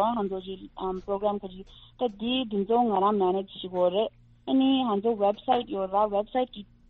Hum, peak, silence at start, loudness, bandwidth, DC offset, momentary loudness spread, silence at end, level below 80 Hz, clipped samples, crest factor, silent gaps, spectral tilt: none; -12 dBFS; 0 s; -27 LUFS; 4.2 kHz; under 0.1%; 11 LU; 0.25 s; -56 dBFS; under 0.1%; 16 dB; none; -4.5 dB/octave